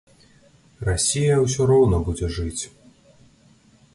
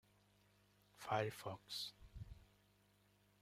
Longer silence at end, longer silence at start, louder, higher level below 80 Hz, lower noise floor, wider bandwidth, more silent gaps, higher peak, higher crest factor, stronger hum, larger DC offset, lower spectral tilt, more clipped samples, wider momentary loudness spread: first, 1.25 s vs 0.95 s; second, 0.8 s vs 0.95 s; first, -21 LUFS vs -46 LUFS; first, -36 dBFS vs -68 dBFS; second, -55 dBFS vs -75 dBFS; second, 11.5 kHz vs 16 kHz; neither; first, -8 dBFS vs -26 dBFS; second, 16 dB vs 26 dB; second, none vs 50 Hz at -70 dBFS; neither; about the same, -5 dB/octave vs -4 dB/octave; neither; second, 13 LU vs 17 LU